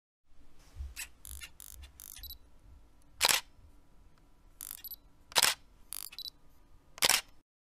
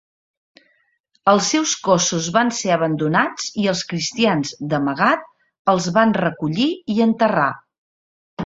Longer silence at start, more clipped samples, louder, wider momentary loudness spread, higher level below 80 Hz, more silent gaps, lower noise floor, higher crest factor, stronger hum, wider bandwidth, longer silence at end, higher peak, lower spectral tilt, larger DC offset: second, 0.3 s vs 1.25 s; neither; second, -31 LUFS vs -19 LUFS; first, 22 LU vs 6 LU; about the same, -56 dBFS vs -60 dBFS; second, none vs 5.59-5.65 s, 7.78-8.37 s; second, -59 dBFS vs -65 dBFS; first, 32 dB vs 18 dB; neither; first, 16.5 kHz vs 7.8 kHz; first, 0.35 s vs 0 s; second, -6 dBFS vs -2 dBFS; second, 0.5 dB/octave vs -4 dB/octave; neither